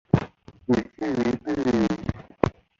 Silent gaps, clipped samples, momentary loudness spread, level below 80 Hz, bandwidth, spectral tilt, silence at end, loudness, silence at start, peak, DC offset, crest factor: none; under 0.1%; 9 LU; -44 dBFS; 7.6 kHz; -7.5 dB/octave; 0.3 s; -26 LUFS; 0.15 s; -2 dBFS; under 0.1%; 24 dB